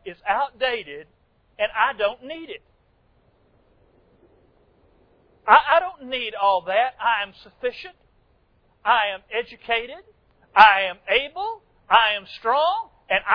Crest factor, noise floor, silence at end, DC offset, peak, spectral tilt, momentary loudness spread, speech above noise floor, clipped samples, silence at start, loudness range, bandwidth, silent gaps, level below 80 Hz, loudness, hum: 24 dB; -62 dBFS; 0 s; under 0.1%; 0 dBFS; -4 dB/octave; 20 LU; 41 dB; under 0.1%; 0.05 s; 9 LU; 5.4 kHz; none; -58 dBFS; -21 LUFS; none